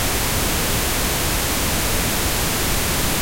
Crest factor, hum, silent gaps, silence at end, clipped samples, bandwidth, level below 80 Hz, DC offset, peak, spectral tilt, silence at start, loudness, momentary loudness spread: 16 dB; none; none; 0 s; under 0.1%; 16.5 kHz; -28 dBFS; under 0.1%; -4 dBFS; -2.5 dB/octave; 0 s; -19 LUFS; 0 LU